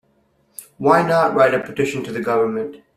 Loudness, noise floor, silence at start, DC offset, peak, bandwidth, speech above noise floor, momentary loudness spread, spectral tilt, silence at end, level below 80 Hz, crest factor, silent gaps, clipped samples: -18 LUFS; -61 dBFS; 0.6 s; under 0.1%; -2 dBFS; 15 kHz; 44 dB; 12 LU; -6 dB/octave; 0.2 s; -58 dBFS; 18 dB; none; under 0.1%